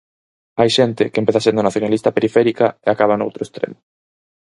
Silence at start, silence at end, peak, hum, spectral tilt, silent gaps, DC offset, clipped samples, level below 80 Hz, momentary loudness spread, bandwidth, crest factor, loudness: 0.55 s; 0.8 s; 0 dBFS; none; -5.5 dB/octave; none; under 0.1%; under 0.1%; -56 dBFS; 10 LU; 11.5 kHz; 18 dB; -17 LUFS